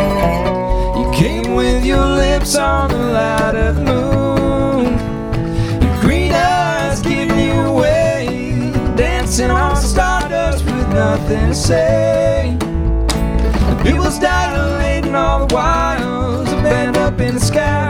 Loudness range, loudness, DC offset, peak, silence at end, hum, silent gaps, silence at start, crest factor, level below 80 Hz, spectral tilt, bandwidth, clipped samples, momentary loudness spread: 1 LU; -15 LUFS; under 0.1%; 0 dBFS; 0 s; none; none; 0 s; 14 dB; -20 dBFS; -5.5 dB/octave; 16.5 kHz; under 0.1%; 4 LU